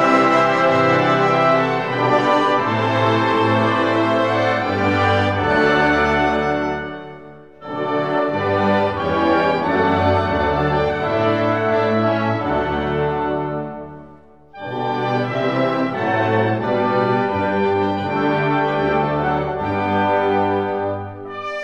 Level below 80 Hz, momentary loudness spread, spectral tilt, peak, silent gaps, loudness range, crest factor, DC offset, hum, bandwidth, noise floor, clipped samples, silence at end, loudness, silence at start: -44 dBFS; 8 LU; -7 dB/octave; -2 dBFS; none; 5 LU; 16 dB; 0.3%; none; 9.8 kHz; -45 dBFS; under 0.1%; 0 s; -18 LUFS; 0 s